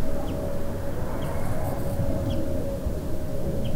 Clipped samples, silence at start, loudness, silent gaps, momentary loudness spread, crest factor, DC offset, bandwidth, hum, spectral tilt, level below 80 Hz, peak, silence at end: under 0.1%; 0 s; -30 LUFS; none; 4 LU; 12 dB; under 0.1%; 16 kHz; none; -7 dB/octave; -32 dBFS; -12 dBFS; 0 s